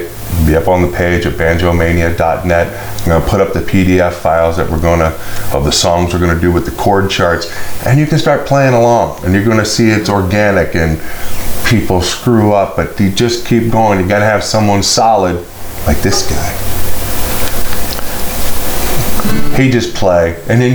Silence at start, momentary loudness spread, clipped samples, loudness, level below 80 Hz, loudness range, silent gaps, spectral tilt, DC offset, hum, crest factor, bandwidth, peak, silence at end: 0 s; 8 LU; under 0.1%; -12 LUFS; -24 dBFS; 4 LU; none; -5 dB/octave; under 0.1%; none; 10 dB; over 20 kHz; 0 dBFS; 0 s